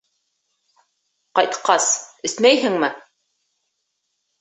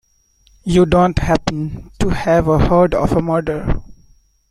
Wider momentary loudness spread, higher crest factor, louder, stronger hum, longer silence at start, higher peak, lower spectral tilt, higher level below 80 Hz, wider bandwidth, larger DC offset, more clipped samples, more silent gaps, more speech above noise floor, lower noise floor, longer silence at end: second, 9 LU vs 12 LU; first, 22 dB vs 14 dB; about the same, -18 LUFS vs -16 LUFS; neither; first, 1.35 s vs 0.65 s; about the same, 0 dBFS vs -2 dBFS; second, -1.5 dB/octave vs -7 dB/octave; second, -72 dBFS vs -28 dBFS; second, 8.4 kHz vs 12 kHz; neither; neither; neither; first, 56 dB vs 41 dB; first, -74 dBFS vs -55 dBFS; first, 1.4 s vs 0.55 s